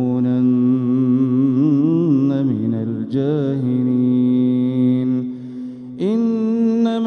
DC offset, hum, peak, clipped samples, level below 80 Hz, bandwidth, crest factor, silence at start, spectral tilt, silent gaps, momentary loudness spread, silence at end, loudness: under 0.1%; none; -6 dBFS; under 0.1%; -64 dBFS; 4.3 kHz; 10 dB; 0 s; -10 dB/octave; none; 7 LU; 0 s; -17 LUFS